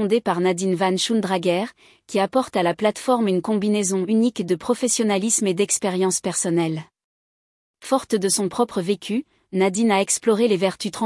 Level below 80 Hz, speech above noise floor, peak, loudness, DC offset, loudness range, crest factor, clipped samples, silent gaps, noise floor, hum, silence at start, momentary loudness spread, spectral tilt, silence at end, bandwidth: -66 dBFS; over 69 dB; -6 dBFS; -21 LUFS; under 0.1%; 3 LU; 14 dB; under 0.1%; 7.04-7.74 s; under -90 dBFS; none; 0 s; 6 LU; -4 dB/octave; 0 s; 12 kHz